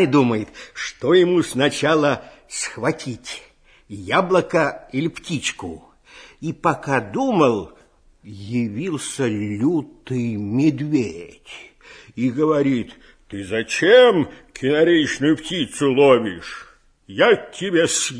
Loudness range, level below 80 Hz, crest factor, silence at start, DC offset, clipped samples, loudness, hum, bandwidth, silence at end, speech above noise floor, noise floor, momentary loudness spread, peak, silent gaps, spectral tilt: 6 LU; -54 dBFS; 18 dB; 0 s; under 0.1%; under 0.1%; -19 LUFS; none; 11 kHz; 0 s; 27 dB; -46 dBFS; 19 LU; -2 dBFS; none; -4.5 dB/octave